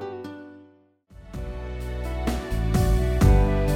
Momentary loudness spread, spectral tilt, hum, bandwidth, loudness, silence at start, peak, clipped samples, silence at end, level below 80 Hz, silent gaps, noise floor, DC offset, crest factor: 20 LU; -7 dB/octave; none; 16 kHz; -24 LUFS; 0 s; -8 dBFS; under 0.1%; 0 s; -26 dBFS; none; -56 dBFS; under 0.1%; 16 dB